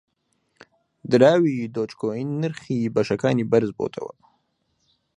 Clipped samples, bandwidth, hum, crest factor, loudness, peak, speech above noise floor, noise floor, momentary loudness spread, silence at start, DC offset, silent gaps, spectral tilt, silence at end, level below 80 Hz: under 0.1%; 10.5 kHz; none; 22 dB; -22 LUFS; -2 dBFS; 49 dB; -71 dBFS; 13 LU; 1.05 s; under 0.1%; none; -7.5 dB/octave; 1.1 s; -64 dBFS